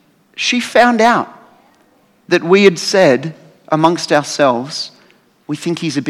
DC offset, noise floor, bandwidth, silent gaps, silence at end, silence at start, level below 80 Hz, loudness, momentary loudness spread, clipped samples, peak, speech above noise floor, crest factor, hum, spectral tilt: under 0.1%; -53 dBFS; 14 kHz; none; 0 s; 0.35 s; -60 dBFS; -13 LUFS; 15 LU; 0.2%; 0 dBFS; 40 dB; 14 dB; none; -4.5 dB/octave